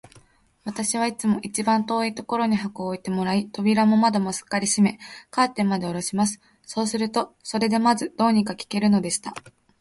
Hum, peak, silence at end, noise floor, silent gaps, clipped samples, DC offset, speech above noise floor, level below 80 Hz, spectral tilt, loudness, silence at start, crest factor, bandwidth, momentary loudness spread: none; -6 dBFS; 0.3 s; -56 dBFS; none; under 0.1%; under 0.1%; 34 dB; -62 dBFS; -4.5 dB/octave; -23 LUFS; 0.65 s; 18 dB; 11.5 kHz; 10 LU